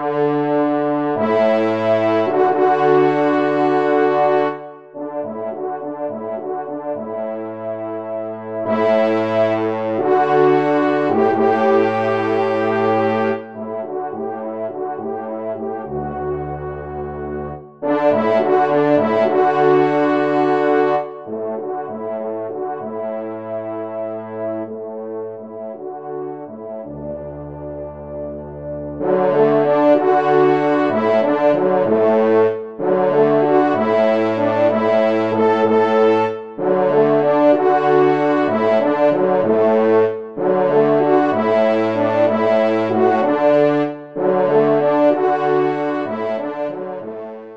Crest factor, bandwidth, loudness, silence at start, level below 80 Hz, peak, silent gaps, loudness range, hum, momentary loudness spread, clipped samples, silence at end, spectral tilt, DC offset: 14 dB; 7 kHz; -17 LUFS; 0 s; -52 dBFS; -2 dBFS; none; 11 LU; none; 14 LU; under 0.1%; 0 s; -8 dB/octave; 0.3%